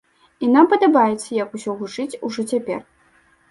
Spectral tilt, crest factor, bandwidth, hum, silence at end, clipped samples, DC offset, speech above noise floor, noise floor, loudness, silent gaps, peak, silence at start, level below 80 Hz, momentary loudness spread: -5 dB/octave; 18 dB; 11.5 kHz; none; 0.7 s; under 0.1%; under 0.1%; 39 dB; -57 dBFS; -19 LUFS; none; -2 dBFS; 0.4 s; -66 dBFS; 14 LU